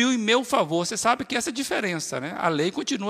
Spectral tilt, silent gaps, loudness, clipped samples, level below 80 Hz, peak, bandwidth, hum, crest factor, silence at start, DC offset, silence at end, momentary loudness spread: -3.5 dB/octave; none; -24 LUFS; under 0.1%; -66 dBFS; -6 dBFS; 15.5 kHz; none; 18 dB; 0 s; under 0.1%; 0 s; 6 LU